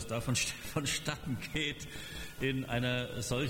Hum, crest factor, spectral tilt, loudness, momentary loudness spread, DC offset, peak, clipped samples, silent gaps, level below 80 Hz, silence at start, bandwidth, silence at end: none; 16 dB; -4 dB/octave; -35 LUFS; 10 LU; under 0.1%; -20 dBFS; under 0.1%; none; -52 dBFS; 0 s; 19 kHz; 0 s